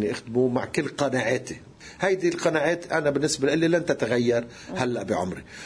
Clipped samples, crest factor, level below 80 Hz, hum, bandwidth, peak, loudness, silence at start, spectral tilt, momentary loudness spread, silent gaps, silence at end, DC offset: under 0.1%; 18 dB; -58 dBFS; none; 10.5 kHz; -8 dBFS; -25 LUFS; 0 s; -5 dB/octave; 7 LU; none; 0 s; under 0.1%